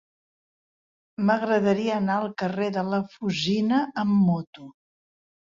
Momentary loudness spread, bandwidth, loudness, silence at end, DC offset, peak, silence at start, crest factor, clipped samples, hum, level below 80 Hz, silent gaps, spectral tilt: 7 LU; 7.4 kHz; -24 LUFS; 0.9 s; under 0.1%; -10 dBFS; 1.2 s; 16 dB; under 0.1%; none; -66 dBFS; 4.47-4.53 s; -6.5 dB/octave